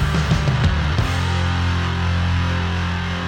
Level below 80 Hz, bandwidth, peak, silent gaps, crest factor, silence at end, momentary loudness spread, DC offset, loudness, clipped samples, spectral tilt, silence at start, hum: -26 dBFS; 10 kHz; -8 dBFS; none; 12 dB; 0 s; 3 LU; under 0.1%; -20 LUFS; under 0.1%; -6 dB/octave; 0 s; none